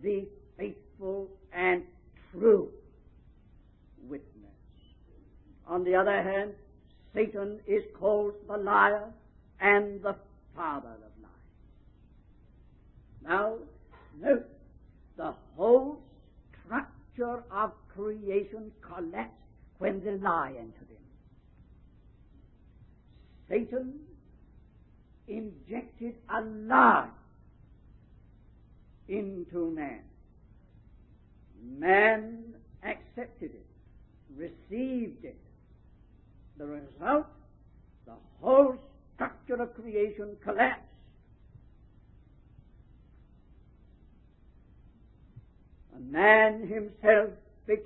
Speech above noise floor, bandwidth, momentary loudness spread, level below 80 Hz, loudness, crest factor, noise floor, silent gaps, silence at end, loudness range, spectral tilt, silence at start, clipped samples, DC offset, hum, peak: 29 dB; 4 kHz; 22 LU; -58 dBFS; -29 LUFS; 26 dB; -58 dBFS; none; 0 s; 12 LU; -3.5 dB/octave; 0 s; under 0.1%; under 0.1%; none; -6 dBFS